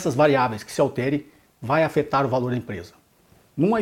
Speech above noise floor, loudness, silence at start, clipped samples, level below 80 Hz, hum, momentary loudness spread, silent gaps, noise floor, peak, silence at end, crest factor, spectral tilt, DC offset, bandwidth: 35 dB; -22 LUFS; 0 s; under 0.1%; -56 dBFS; none; 16 LU; none; -57 dBFS; -4 dBFS; 0 s; 18 dB; -6.5 dB/octave; under 0.1%; 16.5 kHz